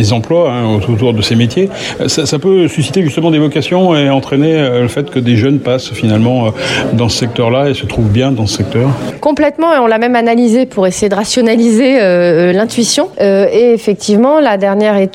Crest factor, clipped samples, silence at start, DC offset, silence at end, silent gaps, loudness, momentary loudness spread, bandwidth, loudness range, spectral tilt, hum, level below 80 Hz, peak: 10 dB; under 0.1%; 0 s; under 0.1%; 0.05 s; none; -11 LUFS; 5 LU; 14.5 kHz; 3 LU; -5.5 dB/octave; none; -40 dBFS; 0 dBFS